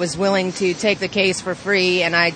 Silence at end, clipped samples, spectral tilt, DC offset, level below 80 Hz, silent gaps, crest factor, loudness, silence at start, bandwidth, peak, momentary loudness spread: 0 s; under 0.1%; -4 dB/octave; under 0.1%; -54 dBFS; none; 16 dB; -18 LUFS; 0 s; 9.4 kHz; -2 dBFS; 4 LU